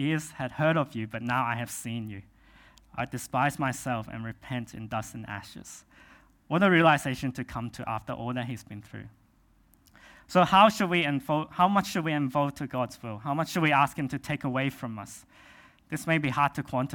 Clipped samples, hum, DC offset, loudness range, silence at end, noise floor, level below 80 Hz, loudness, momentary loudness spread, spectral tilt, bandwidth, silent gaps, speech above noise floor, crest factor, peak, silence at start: under 0.1%; none; under 0.1%; 8 LU; 0 s; -63 dBFS; -60 dBFS; -28 LUFS; 18 LU; -5.5 dB/octave; 18 kHz; none; 35 dB; 24 dB; -6 dBFS; 0 s